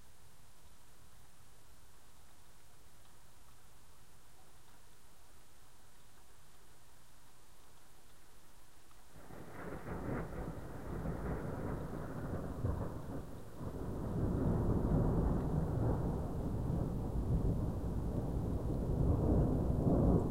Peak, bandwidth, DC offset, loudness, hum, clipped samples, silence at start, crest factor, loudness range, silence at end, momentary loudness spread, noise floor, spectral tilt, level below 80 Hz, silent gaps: -18 dBFS; 16 kHz; 0.4%; -38 LUFS; none; under 0.1%; 0.65 s; 20 dB; 12 LU; 0 s; 14 LU; -63 dBFS; -9 dB/octave; -44 dBFS; none